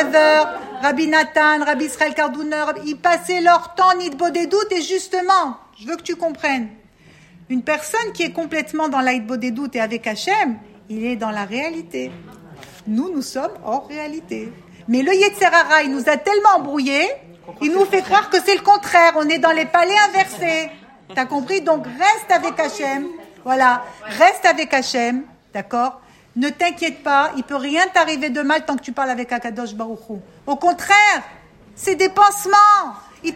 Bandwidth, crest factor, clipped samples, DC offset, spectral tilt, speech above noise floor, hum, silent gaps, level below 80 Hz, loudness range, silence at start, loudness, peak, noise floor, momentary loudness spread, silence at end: 16.5 kHz; 18 dB; under 0.1%; under 0.1%; -2.5 dB/octave; 31 dB; none; none; -60 dBFS; 8 LU; 0 s; -17 LUFS; 0 dBFS; -48 dBFS; 15 LU; 0 s